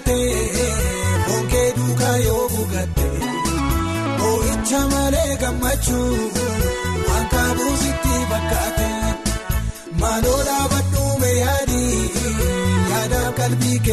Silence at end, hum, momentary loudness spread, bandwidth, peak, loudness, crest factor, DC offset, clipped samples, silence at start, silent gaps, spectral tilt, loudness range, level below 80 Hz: 0 s; none; 4 LU; 13 kHz; -6 dBFS; -20 LUFS; 12 dB; under 0.1%; under 0.1%; 0 s; none; -4.5 dB/octave; 1 LU; -26 dBFS